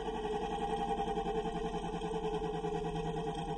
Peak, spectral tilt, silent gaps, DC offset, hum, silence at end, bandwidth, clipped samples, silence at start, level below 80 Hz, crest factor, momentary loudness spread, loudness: -24 dBFS; -6 dB/octave; none; under 0.1%; none; 0 s; 11.5 kHz; under 0.1%; 0 s; -48 dBFS; 12 dB; 3 LU; -37 LUFS